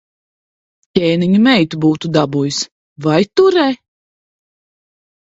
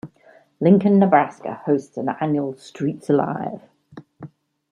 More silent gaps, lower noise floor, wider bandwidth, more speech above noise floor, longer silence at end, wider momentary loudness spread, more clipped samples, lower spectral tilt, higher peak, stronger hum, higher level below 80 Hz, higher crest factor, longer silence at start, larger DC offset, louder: first, 2.72-2.96 s vs none; first, under -90 dBFS vs -53 dBFS; second, 8 kHz vs 9.8 kHz; first, over 77 dB vs 34 dB; first, 1.45 s vs 0.45 s; second, 10 LU vs 15 LU; neither; second, -5.5 dB/octave vs -9 dB/octave; about the same, 0 dBFS vs -2 dBFS; neither; first, -54 dBFS vs -66 dBFS; about the same, 16 dB vs 18 dB; first, 0.95 s vs 0.05 s; neither; first, -14 LUFS vs -20 LUFS